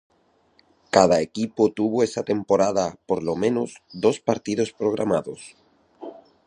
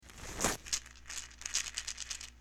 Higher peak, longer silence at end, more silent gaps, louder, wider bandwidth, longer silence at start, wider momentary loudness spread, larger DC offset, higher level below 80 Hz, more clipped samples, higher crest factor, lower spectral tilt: first, 0 dBFS vs -14 dBFS; first, 0.35 s vs 0 s; neither; first, -23 LUFS vs -37 LUFS; second, 10.5 kHz vs 19.5 kHz; first, 0.95 s vs 0 s; first, 18 LU vs 9 LU; neither; about the same, -58 dBFS vs -54 dBFS; neither; about the same, 22 dB vs 26 dB; first, -5.5 dB/octave vs -1 dB/octave